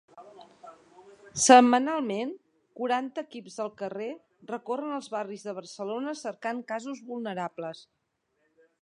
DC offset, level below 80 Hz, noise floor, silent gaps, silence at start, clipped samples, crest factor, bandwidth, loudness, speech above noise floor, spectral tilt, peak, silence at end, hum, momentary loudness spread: under 0.1%; -76 dBFS; -75 dBFS; none; 0.15 s; under 0.1%; 26 dB; 11 kHz; -28 LUFS; 48 dB; -3 dB/octave; -4 dBFS; 1 s; none; 20 LU